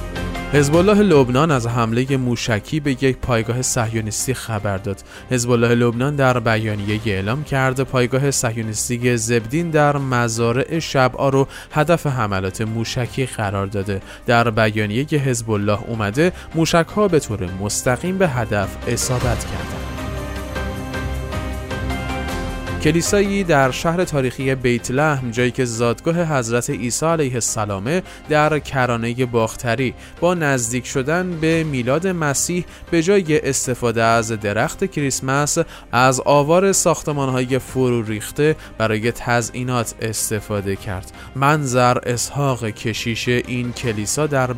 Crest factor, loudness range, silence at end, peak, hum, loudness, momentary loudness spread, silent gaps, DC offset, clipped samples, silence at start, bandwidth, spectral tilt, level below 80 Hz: 16 dB; 4 LU; 0 s; -2 dBFS; none; -19 LUFS; 9 LU; none; under 0.1%; under 0.1%; 0 s; 16 kHz; -5 dB/octave; -38 dBFS